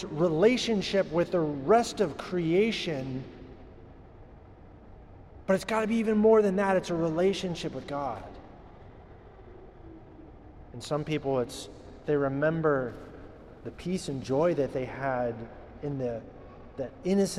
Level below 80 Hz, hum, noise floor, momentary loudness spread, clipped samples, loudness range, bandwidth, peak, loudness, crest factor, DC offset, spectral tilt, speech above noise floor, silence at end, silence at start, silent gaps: -54 dBFS; none; -50 dBFS; 22 LU; under 0.1%; 9 LU; 13.5 kHz; -10 dBFS; -28 LUFS; 18 dB; under 0.1%; -6 dB/octave; 23 dB; 0 s; 0 s; none